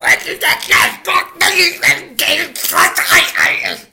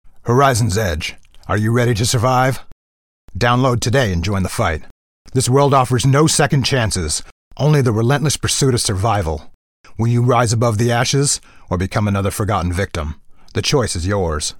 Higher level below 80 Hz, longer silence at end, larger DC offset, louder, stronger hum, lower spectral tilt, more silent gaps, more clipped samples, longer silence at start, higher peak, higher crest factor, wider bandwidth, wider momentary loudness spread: second, -48 dBFS vs -36 dBFS; about the same, 0.1 s vs 0 s; neither; first, -11 LUFS vs -16 LUFS; neither; second, 0 dB/octave vs -5 dB/octave; second, none vs 2.72-3.28 s, 4.91-5.25 s, 7.32-7.51 s, 9.54-9.84 s; neither; about the same, 0 s vs 0.05 s; about the same, 0 dBFS vs -2 dBFS; about the same, 14 dB vs 16 dB; about the same, 17.5 kHz vs 17.5 kHz; second, 5 LU vs 9 LU